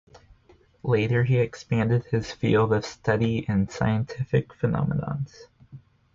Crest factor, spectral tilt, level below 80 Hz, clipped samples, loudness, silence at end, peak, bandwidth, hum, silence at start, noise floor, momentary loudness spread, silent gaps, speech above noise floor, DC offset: 16 dB; -7.5 dB/octave; -48 dBFS; under 0.1%; -25 LUFS; 0.35 s; -10 dBFS; 7.4 kHz; none; 0.85 s; -58 dBFS; 7 LU; none; 34 dB; under 0.1%